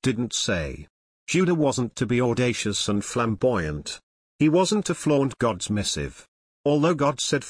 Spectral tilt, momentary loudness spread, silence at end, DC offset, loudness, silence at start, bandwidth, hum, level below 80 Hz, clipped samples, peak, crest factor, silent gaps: -5 dB/octave; 11 LU; 0 s; under 0.1%; -24 LUFS; 0 s; 10.5 kHz; none; -48 dBFS; under 0.1%; -10 dBFS; 14 dB; 0.90-1.27 s, 4.03-4.39 s, 6.28-6.64 s